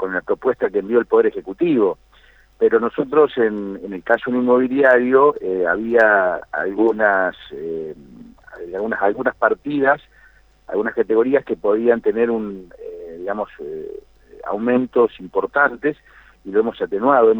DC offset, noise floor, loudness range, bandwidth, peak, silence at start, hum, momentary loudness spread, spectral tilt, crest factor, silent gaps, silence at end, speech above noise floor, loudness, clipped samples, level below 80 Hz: under 0.1%; -51 dBFS; 6 LU; 4.1 kHz; -2 dBFS; 0 s; none; 16 LU; -8 dB/octave; 18 dB; none; 0 s; 33 dB; -18 LUFS; under 0.1%; -54 dBFS